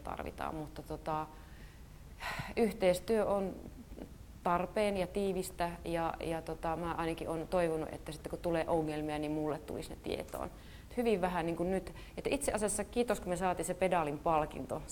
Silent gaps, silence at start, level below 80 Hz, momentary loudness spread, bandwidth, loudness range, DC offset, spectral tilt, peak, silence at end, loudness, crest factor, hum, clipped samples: none; 0 s; -52 dBFS; 14 LU; 18 kHz; 3 LU; under 0.1%; -5 dB/octave; -18 dBFS; 0 s; -36 LUFS; 18 dB; none; under 0.1%